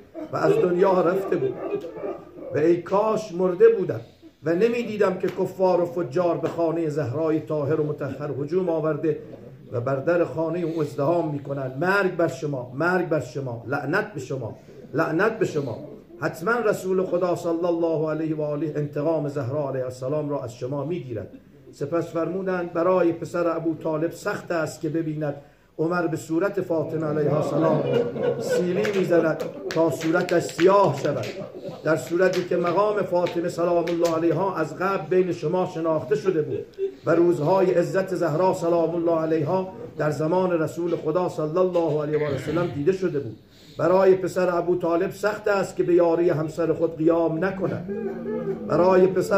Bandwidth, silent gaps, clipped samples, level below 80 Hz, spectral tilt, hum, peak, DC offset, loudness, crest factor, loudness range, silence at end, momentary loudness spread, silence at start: 15.5 kHz; none; under 0.1%; -62 dBFS; -7 dB/octave; none; -6 dBFS; under 0.1%; -24 LUFS; 18 dB; 4 LU; 0 s; 10 LU; 0 s